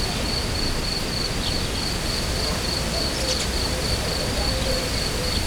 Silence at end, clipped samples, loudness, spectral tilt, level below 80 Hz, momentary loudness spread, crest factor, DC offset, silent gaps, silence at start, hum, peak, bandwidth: 0 s; under 0.1%; -23 LUFS; -3.5 dB/octave; -30 dBFS; 2 LU; 14 dB; under 0.1%; none; 0 s; none; -10 dBFS; over 20 kHz